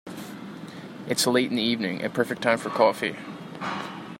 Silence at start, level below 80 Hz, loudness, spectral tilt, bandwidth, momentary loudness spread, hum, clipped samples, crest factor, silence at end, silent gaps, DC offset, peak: 0.05 s; -70 dBFS; -25 LUFS; -3.5 dB/octave; 16 kHz; 17 LU; none; under 0.1%; 22 dB; 0 s; none; under 0.1%; -4 dBFS